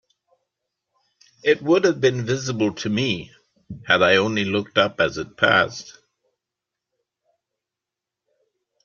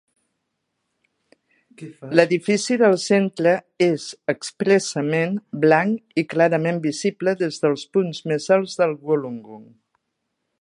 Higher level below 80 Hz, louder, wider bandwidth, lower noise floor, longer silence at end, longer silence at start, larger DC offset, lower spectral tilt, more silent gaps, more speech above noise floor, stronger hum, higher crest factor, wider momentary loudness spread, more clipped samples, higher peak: first, -60 dBFS vs -72 dBFS; about the same, -20 LUFS vs -20 LUFS; second, 7.4 kHz vs 11 kHz; first, -86 dBFS vs -77 dBFS; first, 2.95 s vs 1 s; second, 1.45 s vs 1.8 s; neither; about the same, -4.5 dB/octave vs -5.5 dB/octave; neither; first, 66 dB vs 57 dB; neither; about the same, 22 dB vs 20 dB; about the same, 9 LU vs 9 LU; neither; about the same, -2 dBFS vs 0 dBFS